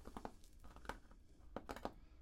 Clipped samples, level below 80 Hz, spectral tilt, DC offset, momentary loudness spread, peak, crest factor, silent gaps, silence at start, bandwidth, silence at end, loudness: under 0.1%; -62 dBFS; -5 dB/octave; under 0.1%; 14 LU; -26 dBFS; 28 dB; none; 0 s; 16 kHz; 0 s; -54 LUFS